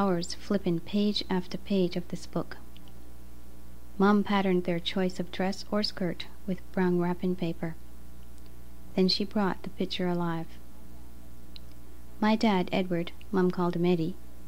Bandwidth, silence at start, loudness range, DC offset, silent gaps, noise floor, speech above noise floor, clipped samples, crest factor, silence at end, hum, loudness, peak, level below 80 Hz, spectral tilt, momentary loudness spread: 16 kHz; 0 s; 3 LU; 2%; none; -49 dBFS; 21 dB; under 0.1%; 18 dB; 0 s; 60 Hz at -50 dBFS; -29 LUFS; -12 dBFS; -50 dBFS; -6.5 dB/octave; 13 LU